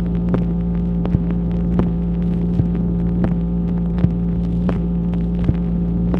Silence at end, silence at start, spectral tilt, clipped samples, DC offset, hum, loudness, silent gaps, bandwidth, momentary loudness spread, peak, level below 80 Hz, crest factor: 0 s; 0 s; -11.5 dB/octave; under 0.1%; under 0.1%; none; -19 LUFS; none; 3.7 kHz; 2 LU; -2 dBFS; -24 dBFS; 16 dB